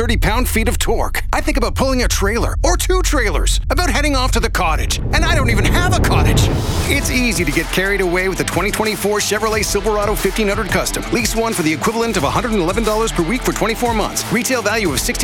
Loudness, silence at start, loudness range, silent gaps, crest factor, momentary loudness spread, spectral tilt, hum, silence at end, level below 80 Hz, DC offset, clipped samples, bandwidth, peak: -16 LUFS; 0 s; 2 LU; none; 14 dB; 3 LU; -4 dB/octave; none; 0 s; -22 dBFS; under 0.1%; under 0.1%; 18 kHz; -2 dBFS